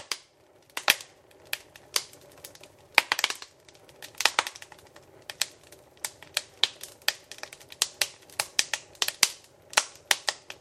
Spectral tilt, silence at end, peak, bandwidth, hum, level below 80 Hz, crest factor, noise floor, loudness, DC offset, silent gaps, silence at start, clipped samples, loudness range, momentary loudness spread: 1.5 dB/octave; 0.1 s; 0 dBFS; 16 kHz; none; -70 dBFS; 32 dB; -60 dBFS; -28 LUFS; under 0.1%; none; 0 s; under 0.1%; 4 LU; 22 LU